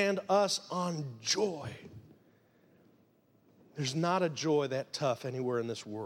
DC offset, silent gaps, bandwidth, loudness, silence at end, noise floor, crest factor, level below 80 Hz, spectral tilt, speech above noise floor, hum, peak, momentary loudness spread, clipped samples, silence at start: under 0.1%; none; 16.5 kHz; -33 LUFS; 0 s; -67 dBFS; 18 dB; -76 dBFS; -4.5 dB/octave; 35 dB; none; -16 dBFS; 14 LU; under 0.1%; 0 s